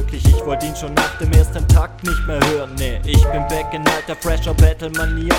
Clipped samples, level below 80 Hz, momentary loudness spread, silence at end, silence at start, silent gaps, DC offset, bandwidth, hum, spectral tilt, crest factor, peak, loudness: under 0.1%; -18 dBFS; 7 LU; 0 s; 0 s; none; under 0.1%; 17 kHz; none; -5.5 dB/octave; 16 dB; 0 dBFS; -17 LUFS